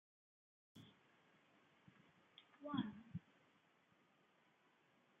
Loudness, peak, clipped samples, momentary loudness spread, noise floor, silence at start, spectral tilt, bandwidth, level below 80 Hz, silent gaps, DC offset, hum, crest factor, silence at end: -50 LUFS; -28 dBFS; under 0.1%; 21 LU; -77 dBFS; 0.75 s; -5.5 dB/octave; 7.2 kHz; -88 dBFS; none; under 0.1%; none; 28 dB; 2 s